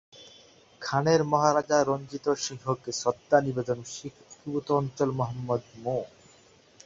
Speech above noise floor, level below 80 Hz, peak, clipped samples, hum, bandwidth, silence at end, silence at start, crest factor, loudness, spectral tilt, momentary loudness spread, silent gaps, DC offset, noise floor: 31 dB; -64 dBFS; -8 dBFS; under 0.1%; none; 7.8 kHz; 0.8 s; 0.15 s; 22 dB; -28 LUFS; -5 dB/octave; 13 LU; none; under 0.1%; -58 dBFS